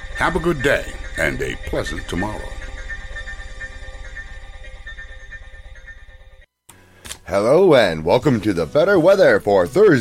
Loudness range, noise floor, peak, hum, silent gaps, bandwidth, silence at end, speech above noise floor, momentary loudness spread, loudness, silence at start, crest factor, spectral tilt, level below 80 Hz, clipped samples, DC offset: 21 LU; -49 dBFS; -2 dBFS; none; none; 16 kHz; 0 s; 33 dB; 23 LU; -17 LUFS; 0 s; 18 dB; -6 dB/octave; -34 dBFS; under 0.1%; under 0.1%